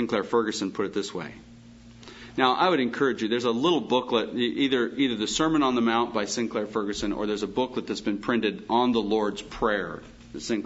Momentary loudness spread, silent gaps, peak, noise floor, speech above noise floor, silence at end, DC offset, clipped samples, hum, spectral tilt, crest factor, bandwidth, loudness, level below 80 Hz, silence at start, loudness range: 9 LU; none; -6 dBFS; -48 dBFS; 23 dB; 0 s; under 0.1%; under 0.1%; none; -4 dB/octave; 20 dB; 8 kHz; -26 LUFS; -54 dBFS; 0 s; 3 LU